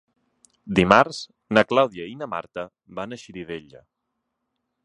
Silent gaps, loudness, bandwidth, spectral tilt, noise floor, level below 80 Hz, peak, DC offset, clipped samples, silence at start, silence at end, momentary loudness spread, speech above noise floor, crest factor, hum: none; -20 LUFS; 11 kHz; -5.5 dB/octave; -79 dBFS; -52 dBFS; 0 dBFS; under 0.1%; under 0.1%; 0.65 s; 1.25 s; 19 LU; 57 dB; 24 dB; none